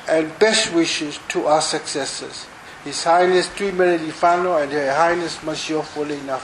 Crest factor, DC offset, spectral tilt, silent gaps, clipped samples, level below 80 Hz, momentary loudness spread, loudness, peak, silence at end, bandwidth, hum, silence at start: 18 dB; under 0.1%; -3 dB/octave; none; under 0.1%; -56 dBFS; 11 LU; -19 LUFS; -2 dBFS; 0 s; 12 kHz; none; 0 s